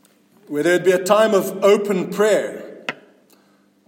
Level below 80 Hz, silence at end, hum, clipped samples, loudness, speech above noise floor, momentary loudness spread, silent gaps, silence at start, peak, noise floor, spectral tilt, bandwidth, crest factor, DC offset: -70 dBFS; 0.95 s; none; under 0.1%; -17 LUFS; 40 dB; 15 LU; none; 0.5 s; -2 dBFS; -57 dBFS; -4.5 dB/octave; 17 kHz; 18 dB; under 0.1%